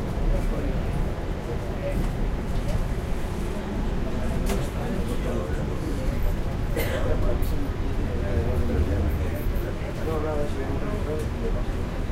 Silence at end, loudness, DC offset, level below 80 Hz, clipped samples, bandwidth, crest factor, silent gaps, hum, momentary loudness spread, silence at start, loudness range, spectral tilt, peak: 0 s; -28 LUFS; under 0.1%; -28 dBFS; under 0.1%; 15.5 kHz; 14 dB; none; none; 4 LU; 0 s; 2 LU; -7 dB/octave; -12 dBFS